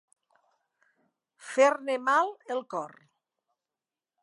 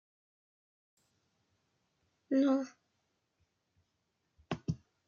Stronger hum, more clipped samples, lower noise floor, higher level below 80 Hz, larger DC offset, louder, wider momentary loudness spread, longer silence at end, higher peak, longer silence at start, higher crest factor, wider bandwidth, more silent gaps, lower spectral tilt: neither; neither; first, under -90 dBFS vs -82 dBFS; second, under -90 dBFS vs -70 dBFS; neither; first, -27 LUFS vs -34 LUFS; about the same, 15 LU vs 14 LU; first, 1.35 s vs 0.3 s; first, -10 dBFS vs -20 dBFS; second, 1.45 s vs 2.3 s; about the same, 22 dB vs 20 dB; first, 11.5 kHz vs 7 kHz; neither; second, -2.5 dB/octave vs -7.5 dB/octave